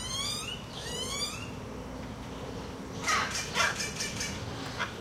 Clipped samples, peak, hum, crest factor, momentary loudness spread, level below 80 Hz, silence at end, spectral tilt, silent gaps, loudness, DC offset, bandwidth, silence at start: under 0.1%; -14 dBFS; none; 22 dB; 13 LU; -50 dBFS; 0 s; -2.5 dB/octave; none; -33 LUFS; under 0.1%; 16 kHz; 0 s